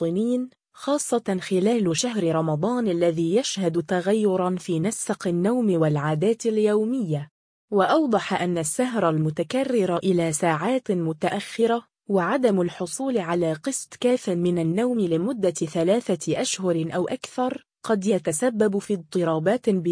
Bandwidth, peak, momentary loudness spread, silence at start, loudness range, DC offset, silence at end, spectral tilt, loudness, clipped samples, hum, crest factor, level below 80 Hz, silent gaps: 10.5 kHz; -8 dBFS; 6 LU; 0 s; 2 LU; under 0.1%; 0 s; -5.5 dB/octave; -24 LUFS; under 0.1%; none; 16 dB; -66 dBFS; 7.31-7.68 s